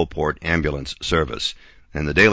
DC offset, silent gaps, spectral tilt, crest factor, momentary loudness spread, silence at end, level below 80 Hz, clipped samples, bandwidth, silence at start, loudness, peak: under 0.1%; none; -5 dB/octave; 18 dB; 7 LU; 0 s; -34 dBFS; under 0.1%; 8 kHz; 0 s; -22 LUFS; -2 dBFS